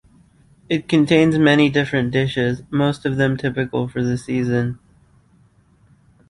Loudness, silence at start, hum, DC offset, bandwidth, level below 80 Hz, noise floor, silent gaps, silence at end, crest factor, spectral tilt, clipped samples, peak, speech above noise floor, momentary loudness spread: -19 LUFS; 0.7 s; none; under 0.1%; 11.5 kHz; -50 dBFS; -55 dBFS; none; 1.55 s; 18 dB; -7 dB/octave; under 0.1%; -2 dBFS; 37 dB; 9 LU